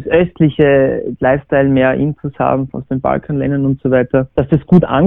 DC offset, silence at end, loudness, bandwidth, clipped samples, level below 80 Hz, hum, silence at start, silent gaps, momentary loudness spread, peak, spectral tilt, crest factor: under 0.1%; 0 s; -14 LUFS; 3.8 kHz; under 0.1%; -38 dBFS; none; 0 s; none; 7 LU; 0 dBFS; -11 dB/octave; 12 dB